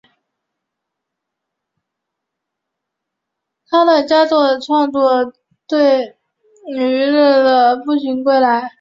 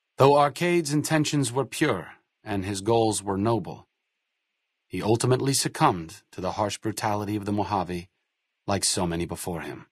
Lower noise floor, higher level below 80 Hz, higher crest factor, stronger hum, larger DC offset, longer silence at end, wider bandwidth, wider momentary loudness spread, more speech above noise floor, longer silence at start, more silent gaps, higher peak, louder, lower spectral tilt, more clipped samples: about the same, -79 dBFS vs -80 dBFS; second, -66 dBFS vs -60 dBFS; second, 14 dB vs 22 dB; neither; neither; about the same, 0.1 s vs 0.1 s; second, 7.6 kHz vs 12 kHz; second, 8 LU vs 13 LU; first, 66 dB vs 55 dB; first, 3.7 s vs 0.2 s; neither; about the same, -2 dBFS vs -4 dBFS; first, -14 LUFS vs -25 LUFS; about the same, -4.5 dB/octave vs -4.5 dB/octave; neither